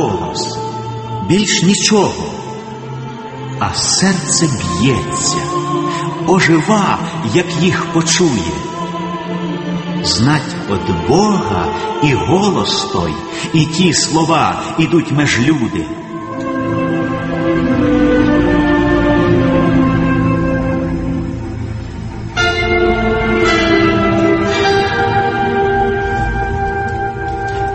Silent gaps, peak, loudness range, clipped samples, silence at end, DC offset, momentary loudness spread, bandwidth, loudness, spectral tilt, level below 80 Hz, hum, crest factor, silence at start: none; 0 dBFS; 3 LU; under 0.1%; 0 s; under 0.1%; 11 LU; 8.8 kHz; -14 LUFS; -4.5 dB/octave; -30 dBFS; none; 14 dB; 0 s